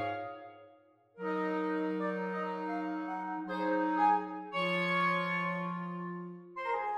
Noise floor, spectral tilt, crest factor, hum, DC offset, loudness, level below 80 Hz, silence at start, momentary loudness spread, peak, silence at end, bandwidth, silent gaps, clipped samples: -63 dBFS; -7 dB/octave; 16 dB; none; under 0.1%; -34 LUFS; -82 dBFS; 0 s; 13 LU; -18 dBFS; 0 s; 10.5 kHz; none; under 0.1%